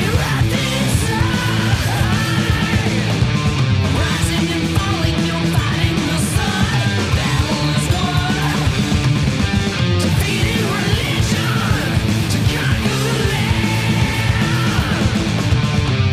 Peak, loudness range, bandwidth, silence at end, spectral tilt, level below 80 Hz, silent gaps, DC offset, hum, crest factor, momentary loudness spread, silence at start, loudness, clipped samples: -6 dBFS; 0 LU; 16 kHz; 0 s; -5 dB/octave; -28 dBFS; none; under 0.1%; none; 12 dB; 1 LU; 0 s; -17 LUFS; under 0.1%